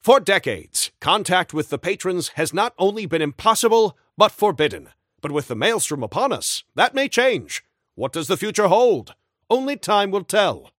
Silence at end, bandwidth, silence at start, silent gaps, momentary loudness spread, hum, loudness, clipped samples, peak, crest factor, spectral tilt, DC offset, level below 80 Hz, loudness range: 0.15 s; 16.5 kHz; 0.05 s; none; 9 LU; none; -20 LUFS; under 0.1%; 0 dBFS; 20 dB; -3 dB/octave; under 0.1%; -60 dBFS; 2 LU